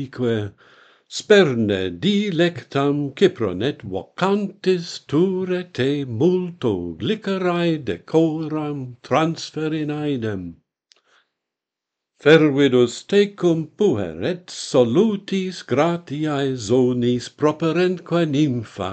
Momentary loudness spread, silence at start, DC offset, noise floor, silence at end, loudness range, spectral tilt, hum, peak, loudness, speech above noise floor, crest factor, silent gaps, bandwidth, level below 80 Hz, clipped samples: 10 LU; 0 s; under 0.1%; -85 dBFS; 0 s; 4 LU; -6 dB/octave; none; 0 dBFS; -20 LUFS; 65 dB; 20 dB; none; 9 kHz; -60 dBFS; under 0.1%